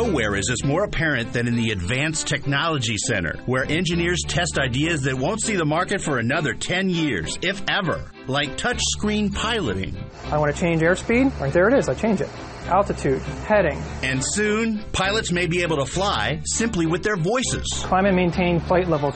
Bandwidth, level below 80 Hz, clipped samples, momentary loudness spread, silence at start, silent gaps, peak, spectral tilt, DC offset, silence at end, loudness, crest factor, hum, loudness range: 8.8 kHz; -38 dBFS; under 0.1%; 5 LU; 0 s; none; -6 dBFS; -4.5 dB/octave; under 0.1%; 0 s; -22 LUFS; 16 dB; none; 2 LU